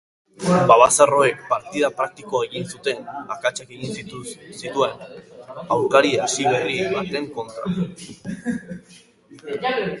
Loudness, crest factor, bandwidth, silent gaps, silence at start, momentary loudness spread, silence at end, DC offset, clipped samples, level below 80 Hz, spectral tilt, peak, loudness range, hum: -21 LUFS; 22 dB; 11.5 kHz; none; 0.4 s; 20 LU; 0 s; under 0.1%; under 0.1%; -58 dBFS; -4 dB/octave; 0 dBFS; 9 LU; none